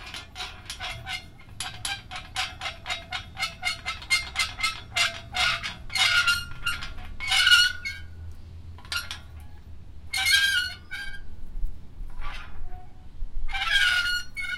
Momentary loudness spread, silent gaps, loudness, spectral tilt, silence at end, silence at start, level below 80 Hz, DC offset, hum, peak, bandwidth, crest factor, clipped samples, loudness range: 24 LU; none; -25 LUFS; 0 dB/octave; 0 s; 0 s; -38 dBFS; under 0.1%; none; -4 dBFS; 16.5 kHz; 24 dB; under 0.1%; 9 LU